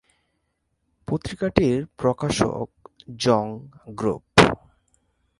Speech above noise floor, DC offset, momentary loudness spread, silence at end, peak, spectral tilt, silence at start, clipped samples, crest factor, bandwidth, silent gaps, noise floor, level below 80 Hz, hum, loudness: 50 dB; under 0.1%; 20 LU; 0.85 s; 0 dBFS; -5 dB/octave; 1.1 s; under 0.1%; 24 dB; 11.5 kHz; none; -74 dBFS; -46 dBFS; none; -22 LUFS